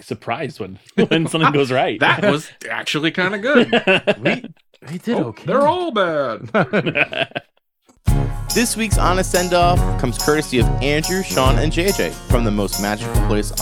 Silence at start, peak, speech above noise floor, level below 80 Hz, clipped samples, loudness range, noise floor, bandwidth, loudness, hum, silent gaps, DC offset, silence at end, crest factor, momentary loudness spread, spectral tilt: 0.05 s; 0 dBFS; 40 dB; -26 dBFS; under 0.1%; 3 LU; -57 dBFS; 19.5 kHz; -18 LUFS; none; none; under 0.1%; 0 s; 18 dB; 9 LU; -4.5 dB/octave